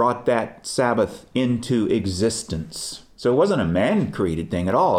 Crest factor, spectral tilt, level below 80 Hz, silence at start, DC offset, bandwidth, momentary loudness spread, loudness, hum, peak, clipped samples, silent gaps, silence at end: 16 dB; -5.5 dB/octave; -48 dBFS; 0 s; under 0.1%; 15.5 kHz; 8 LU; -22 LUFS; none; -6 dBFS; under 0.1%; none; 0 s